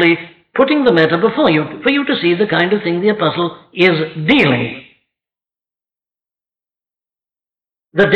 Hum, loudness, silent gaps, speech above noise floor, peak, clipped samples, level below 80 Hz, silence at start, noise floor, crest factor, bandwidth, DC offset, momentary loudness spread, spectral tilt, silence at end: none; -14 LUFS; none; over 76 dB; -2 dBFS; under 0.1%; -52 dBFS; 0 s; under -90 dBFS; 14 dB; 6.4 kHz; under 0.1%; 9 LU; -7.5 dB/octave; 0 s